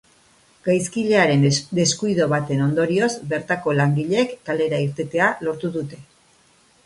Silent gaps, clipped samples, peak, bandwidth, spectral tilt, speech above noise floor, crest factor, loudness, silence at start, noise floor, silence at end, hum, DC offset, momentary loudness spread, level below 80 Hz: none; under 0.1%; -4 dBFS; 11.5 kHz; -5 dB/octave; 37 dB; 18 dB; -20 LUFS; 0.65 s; -57 dBFS; 0.85 s; none; under 0.1%; 9 LU; -58 dBFS